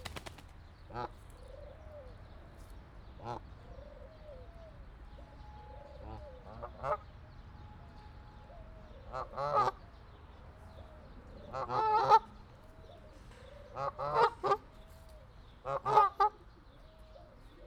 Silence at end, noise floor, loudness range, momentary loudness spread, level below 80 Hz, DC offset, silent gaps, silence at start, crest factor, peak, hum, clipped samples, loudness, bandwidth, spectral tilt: 0 s; -57 dBFS; 18 LU; 26 LU; -54 dBFS; under 0.1%; none; 0 s; 26 dB; -12 dBFS; none; under 0.1%; -33 LUFS; 13.5 kHz; -5.5 dB/octave